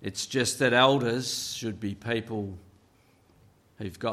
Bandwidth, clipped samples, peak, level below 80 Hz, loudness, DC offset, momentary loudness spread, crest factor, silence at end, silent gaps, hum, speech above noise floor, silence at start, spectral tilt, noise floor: 15 kHz; under 0.1%; -6 dBFS; -64 dBFS; -27 LUFS; under 0.1%; 19 LU; 22 dB; 0 s; none; none; 35 dB; 0 s; -3.5 dB/octave; -62 dBFS